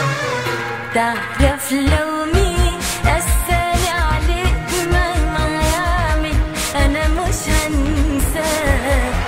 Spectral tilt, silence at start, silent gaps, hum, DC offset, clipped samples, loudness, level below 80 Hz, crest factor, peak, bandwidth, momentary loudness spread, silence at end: -4.5 dB/octave; 0 s; none; none; 0.3%; under 0.1%; -18 LUFS; -20 dBFS; 16 dB; -2 dBFS; 16.5 kHz; 3 LU; 0 s